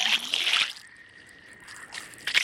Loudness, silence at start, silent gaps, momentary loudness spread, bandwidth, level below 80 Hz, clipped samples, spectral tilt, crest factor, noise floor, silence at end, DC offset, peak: -24 LUFS; 0 s; none; 22 LU; 16.5 kHz; -72 dBFS; under 0.1%; 1.5 dB/octave; 22 dB; -51 dBFS; 0 s; under 0.1%; -8 dBFS